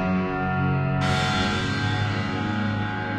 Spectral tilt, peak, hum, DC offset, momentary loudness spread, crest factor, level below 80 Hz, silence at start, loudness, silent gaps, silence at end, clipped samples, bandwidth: -6 dB/octave; -10 dBFS; none; under 0.1%; 4 LU; 14 dB; -44 dBFS; 0 s; -24 LUFS; none; 0 s; under 0.1%; 10.5 kHz